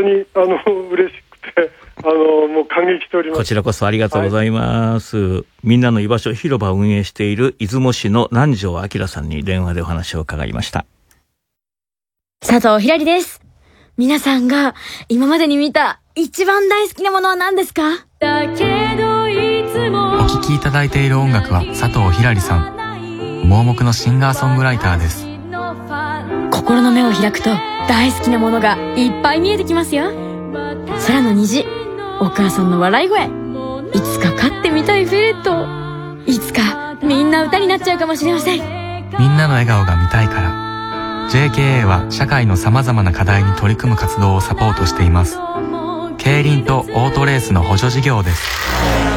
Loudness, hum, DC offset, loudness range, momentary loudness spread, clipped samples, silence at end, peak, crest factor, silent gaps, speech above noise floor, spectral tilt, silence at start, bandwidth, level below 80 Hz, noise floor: -15 LUFS; none; under 0.1%; 3 LU; 9 LU; under 0.1%; 0 s; 0 dBFS; 14 dB; none; over 76 dB; -6 dB/octave; 0 s; 17 kHz; -34 dBFS; under -90 dBFS